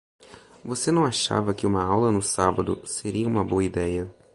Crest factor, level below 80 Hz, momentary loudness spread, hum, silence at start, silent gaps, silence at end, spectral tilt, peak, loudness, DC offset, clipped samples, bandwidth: 20 dB; -46 dBFS; 7 LU; none; 0.3 s; none; 0.2 s; -5 dB/octave; -4 dBFS; -24 LUFS; under 0.1%; under 0.1%; 11.5 kHz